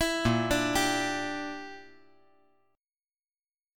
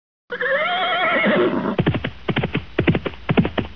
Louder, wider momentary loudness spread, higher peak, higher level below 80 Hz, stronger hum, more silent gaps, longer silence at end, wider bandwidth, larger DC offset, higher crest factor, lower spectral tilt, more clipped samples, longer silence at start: second, -28 LUFS vs -20 LUFS; first, 17 LU vs 7 LU; second, -12 dBFS vs -2 dBFS; second, -50 dBFS vs -40 dBFS; neither; neither; first, 1.9 s vs 0 s; first, 17.5 kHz vs 5.4 kHz; second, under 0.1% vs 1%; about the same, 20 dB vs 18 dB; second, -4 dB/octave vs -8.5 dB/octave; neither; second, 0 s vs 0.3 s